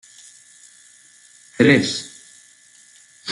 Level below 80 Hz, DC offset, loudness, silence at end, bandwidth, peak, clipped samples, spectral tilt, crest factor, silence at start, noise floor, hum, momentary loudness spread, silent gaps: -64 dBFS; under 0.1%; -17 LUFS; 0 s; 12 kHz; -2 dBFS; under 0.1%; -4.5 dB/octave; 22 dB; 1.6 s; -51 dBFS; none; 28 LU; none